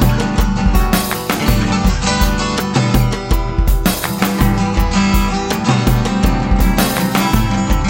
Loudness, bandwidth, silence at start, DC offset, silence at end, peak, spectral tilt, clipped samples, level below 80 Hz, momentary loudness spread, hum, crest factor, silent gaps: -15 LUFS; 17 kHz; 0 s; under 0.1%; 0 s; 0 dBFS; -5 dB/octave; under 0.1%; -18 dBFS; 3 LU; none; 14 dB; none